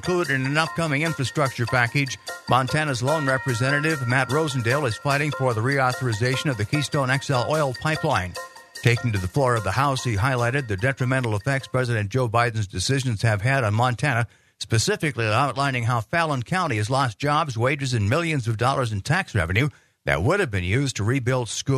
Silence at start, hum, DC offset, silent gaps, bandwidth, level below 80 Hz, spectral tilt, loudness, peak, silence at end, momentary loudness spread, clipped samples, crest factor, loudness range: 0 s; none; under 0.1%; none; 13.5 kHz; -50 dBFS; -5 dB/octave; -23 LUFS; -2 dBFS; 0 s; 3 LU; under 0.1%; 20 dB; 1 LU